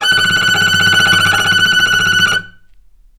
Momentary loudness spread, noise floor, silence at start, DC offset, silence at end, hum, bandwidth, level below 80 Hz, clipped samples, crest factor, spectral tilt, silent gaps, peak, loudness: 3 LU; -43 dBFS; 0 s; under 0.1%; 0.7 s; none; 19 kHz; -46 dBFS; under 0.1%; 12 dB; -1 dB/octave; none; 0 dBFS; -10 LUFS